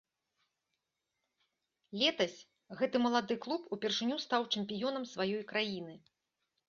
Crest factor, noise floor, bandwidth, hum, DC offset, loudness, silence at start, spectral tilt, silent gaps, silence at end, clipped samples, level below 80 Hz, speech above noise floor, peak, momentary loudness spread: 22 dB; -87 dBFS; 7.2 kHz; none; under 0.1%; -35 LUFS; 1.9 s; -2 dB/octave; none; 0.7 s; under 0.1%; -80 dBFS; 51 dB; -16 dBFS; 8 LU